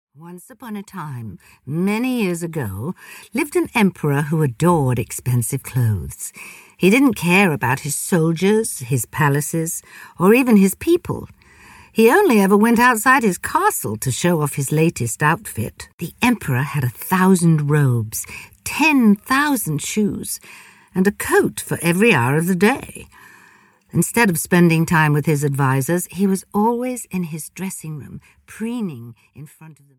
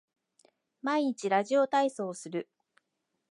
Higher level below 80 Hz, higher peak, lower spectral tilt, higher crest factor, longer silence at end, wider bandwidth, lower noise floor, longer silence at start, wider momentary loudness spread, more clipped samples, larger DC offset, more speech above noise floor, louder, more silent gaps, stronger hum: first, -50 dBFS vs -90 dBFS; first, -2 dBFS vs -14 dBFS; about the same, -5.5 dB/octave vs -4.5 dB/octave; about the same, 16 dB vs 18 dB; second, 0.25 s vs 0.9 s; first, 18 kHz vs 11.5 kHz; second, -52 dBFS vs -82 dBFS; second, 0.2 s vs 0.85 s; first, 16 LU vs 12 LU; neither; neither; second, 33 dB vs 53 dB; first, -18 LUFS vs -30 LUFS; first, 15.93-15.98 s vs none; neither